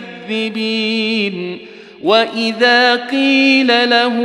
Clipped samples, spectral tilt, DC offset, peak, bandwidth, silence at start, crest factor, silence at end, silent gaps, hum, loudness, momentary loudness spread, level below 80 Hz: under 0.1%; -4 dB/octave; under 0.1%; -2 dBFS; 11.5 kHz; 0 s; 14 dB; 0 s; none; none; -13 LUFS; 12 LU; -68 dBFS